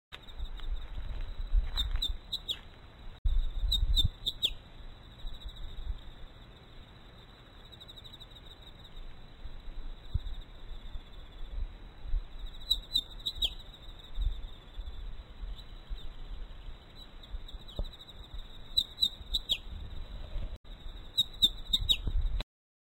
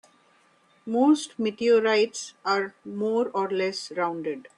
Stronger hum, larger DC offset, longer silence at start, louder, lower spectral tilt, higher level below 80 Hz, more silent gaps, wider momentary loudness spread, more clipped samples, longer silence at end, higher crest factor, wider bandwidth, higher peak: neither; neither; second, 0.1 s vs 0.85 s; second, -33 LUFS vs -25 LUFS; about the same, -3 dB/octave vs -4 dB/octave; first, -38 dBFS vs -74 dBFS; first, 3.18-3.25 s, 20.57-20.64 s vs none; first, 23 LU vs 10 LU; neither; first, 0.4 s vs 0.15 s; first, 22 dB vs 16 dB; first, 16 kHz vs 11.5 kHz; second, -14 dBFS vs -10 dBFS